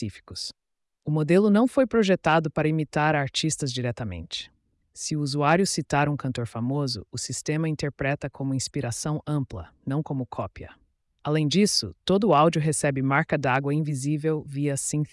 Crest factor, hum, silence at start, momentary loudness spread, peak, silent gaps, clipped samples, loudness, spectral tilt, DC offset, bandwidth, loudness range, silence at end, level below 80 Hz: 16 dB; none; 0 s; 14 LU; -10 dBFS; none; under 0.1%; -25 LUFS; -5 dB/octave; under 0.1%; 12 kHz; 6 LU; 0.05 s; -56 dBFS